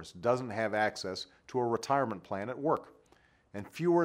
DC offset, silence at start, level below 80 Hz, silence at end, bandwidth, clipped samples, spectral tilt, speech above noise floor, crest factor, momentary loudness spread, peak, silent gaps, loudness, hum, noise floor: under 0.1%; 0 s; -72 dBFS; 0 s; 15 kHz; under 0.1%; -5.5 dB/octave; 34 dB; 20 dB; 11 LU; -14 dBFS; none; -33 LUFS; none; -66 dBFS